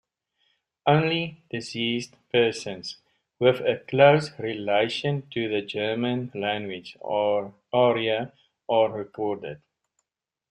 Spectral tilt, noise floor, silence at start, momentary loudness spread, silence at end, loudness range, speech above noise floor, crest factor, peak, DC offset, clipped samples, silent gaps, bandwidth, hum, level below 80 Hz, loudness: -6 dB/octave; -86 dBFS; 0.85 s; 14 LU; 0.95 s; 3 LU; 62 dB; 22 dB; -4 dBFS; under 0.1%; under 0.1%; none; 11 kHz; none; -66 dBFS; -25 LUFS